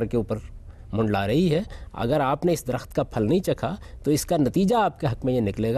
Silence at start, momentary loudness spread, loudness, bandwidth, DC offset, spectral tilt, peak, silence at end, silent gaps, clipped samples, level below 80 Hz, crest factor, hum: 0 s; 10 LU; -24 LUFS; 14 kHz; under 0.1%; -6.5 dB/octave; -12 dBFS; 0 s; none; under 0.1%; -42 dBFS; 12 dB; none